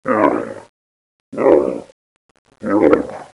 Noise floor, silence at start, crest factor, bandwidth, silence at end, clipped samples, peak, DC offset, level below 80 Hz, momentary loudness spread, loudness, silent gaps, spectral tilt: under -90 dBFS; 0.05 s; 18 dB; 11 kHz; 0.1 s; under 0.1%; 0 dBFS; under 0.1%; -52 dBFS; 17 LU; -16 LUFS; 0.69-1.32 s, 1.92-2.45 s; -7.5 dB/octave